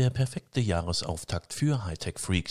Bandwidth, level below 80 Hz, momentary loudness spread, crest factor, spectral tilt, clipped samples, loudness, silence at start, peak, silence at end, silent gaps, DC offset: 15 kHz; -42 dBFS; 6 LU; 16 dB; -5 dB/octave; under 0.1%; -30 LUFS; 0 s; -12 dBFS; 0 s; none; under 0.1%